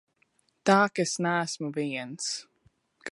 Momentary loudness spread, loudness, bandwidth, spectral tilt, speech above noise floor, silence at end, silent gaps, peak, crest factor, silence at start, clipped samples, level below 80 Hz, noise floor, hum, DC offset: 10 LU; -28 LUFS; 11.5 kHz; -4 dB/octave; 43 dB; 0 s; none; -6 dBFS; 24 dB; 0.65 s; under 0.1%; -78 dBFS; -70 dBFS; none; under 0.1%